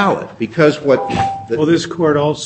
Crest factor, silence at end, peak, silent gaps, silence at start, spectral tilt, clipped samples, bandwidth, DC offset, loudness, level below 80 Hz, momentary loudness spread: 14 dB; 0 s; 0 dBFS; none; 0 s; -6 dB/octave; under 0.1%; 8.6 kHz; under 0.1%; -15 LUFS; -46 dBFS; 6 LU